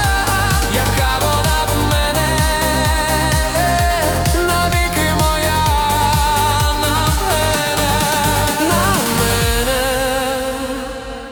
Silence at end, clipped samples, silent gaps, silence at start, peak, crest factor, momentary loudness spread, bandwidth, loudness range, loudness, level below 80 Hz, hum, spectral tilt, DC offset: 0 s; under 0.1%; none; 0 s; -2 dBFS; 14 dB; 2 LU; over 20 kHz; 0 LU; -15 LUFS; -24 dBFS; none; -3.5 dB/octave; under 0.1%